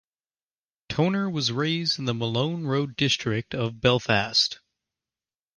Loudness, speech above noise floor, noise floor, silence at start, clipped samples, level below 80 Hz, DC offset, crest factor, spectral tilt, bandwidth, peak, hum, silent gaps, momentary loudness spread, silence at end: -25 LUFS; over 65 dB; under -90 dBFS; 0.9 s; under 0.1%; -56 dBFS; under 0.1%; 20 dB; -4.5 dB/octave; 10.5 kHz; -6 dBFS; none; none; 6 LU; 1.05 s